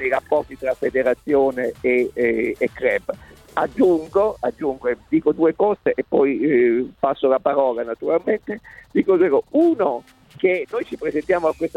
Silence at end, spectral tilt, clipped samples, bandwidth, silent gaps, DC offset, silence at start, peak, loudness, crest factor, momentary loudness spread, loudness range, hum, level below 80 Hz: 0.1 s; -7.5 dB/octave; under 0.1%; 11 kHz; none; under 0.1%; 0 s; -4 dBFS; -20 LUFS; 16 dB; 8 LU; 2 LU; none; -52 dBFS